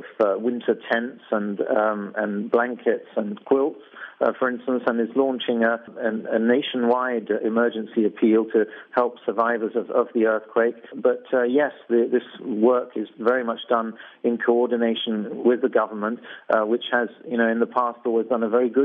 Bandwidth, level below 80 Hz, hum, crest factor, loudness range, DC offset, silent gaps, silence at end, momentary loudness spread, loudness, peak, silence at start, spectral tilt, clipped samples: 4.5 kHz; -80 dBFS; none; 16 dB; 2 LU; under 0.1%; none; 0 s; 6 LU; -23 LUFS; -6 dBFS; 0 s; -8.5 dB/octave; under 0.1%